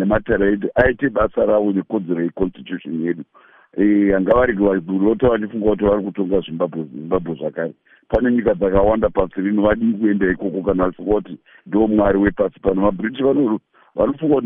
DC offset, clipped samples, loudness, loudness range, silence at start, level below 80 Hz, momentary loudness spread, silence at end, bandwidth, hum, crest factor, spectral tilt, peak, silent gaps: under 0.1%; under 0.1%; -18 LUFS; 2 LU; 0 s; -38 dBFS; 9 LU; 0 s; 3.8 kHz; none; 16 dB; -6.5 dB/octave; -2 dBFS; none